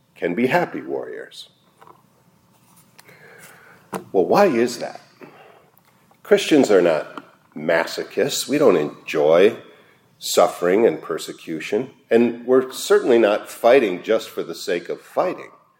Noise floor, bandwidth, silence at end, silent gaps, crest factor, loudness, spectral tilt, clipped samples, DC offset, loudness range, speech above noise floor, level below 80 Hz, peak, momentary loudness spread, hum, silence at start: -57 dBFS; 17 kHz; 0.35 s; none; 18 dB; -19 LUFS; -4.5 dB/octave; under 0.1%; under 0.1%; 8 LU; 38 dB; -74 dBFS; -2 dBFS; 16 LU; none; 0.2 s